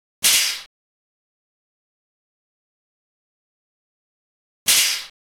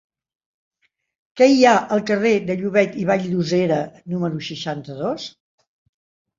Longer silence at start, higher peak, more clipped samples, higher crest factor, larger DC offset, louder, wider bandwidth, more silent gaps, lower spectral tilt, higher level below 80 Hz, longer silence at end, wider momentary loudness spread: second, 0.2 s vs 1.35 s; second, -6 dBFS vs -2 dBFS; neither; about the same, 20 dB vs 20 dB; neither; about the same, -17 LUFS vs -19 LUFS; first, over 20 kHz vs 7.6 kHz; first, 0.66-4.66 s vs none; second, 3 dB/octave vs -6 dB/octave; about the same, -66 dBFS vs -62 dBFS; second, 0.35 s vs 1.1 s; second, 11 LU vs 14 LU